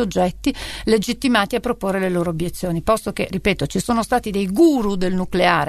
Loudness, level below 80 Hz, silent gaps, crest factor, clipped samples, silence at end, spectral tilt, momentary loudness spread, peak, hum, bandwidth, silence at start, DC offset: -20 LUFS; -38 dBFS; none; 18 dB; under 0.1%; 0 s; -5.5 dB/octave; 8 LU; 0 dBFS; none; 13.5 kHz; 0 s; under 0.1%